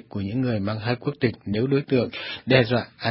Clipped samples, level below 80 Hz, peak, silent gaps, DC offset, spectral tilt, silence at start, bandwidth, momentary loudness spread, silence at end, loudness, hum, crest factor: under 0.1%; -52 dBFS; -2 dBFS; none; under 0.1%; -11 dB/octave; 0.15 s; 5.8 kHz; 8 LU; 0 s; -24 LUFS; none; 22 dB